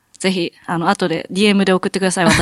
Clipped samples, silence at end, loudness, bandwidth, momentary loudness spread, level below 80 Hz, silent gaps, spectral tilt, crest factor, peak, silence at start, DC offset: under 0.1%; 0 s; -17 LUFS; 13 kHz; 6 LU; -44 dBFS; none; -4.5 dB/octave; 16 dB; 0 dBFS; 0.2 s; under 0.1%